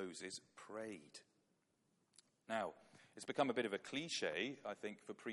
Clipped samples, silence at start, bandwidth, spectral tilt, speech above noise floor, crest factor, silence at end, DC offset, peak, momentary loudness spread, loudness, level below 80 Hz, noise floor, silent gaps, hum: under 0.1%; 0 s; 11.5 kHz; -3.5 dB/octave; 37 dB; 24 dB; 0 s; under 0.1%; -22 dBFS; 17 LU; -45 LUFS; under -90 dBFS; -82 dBFS; none; none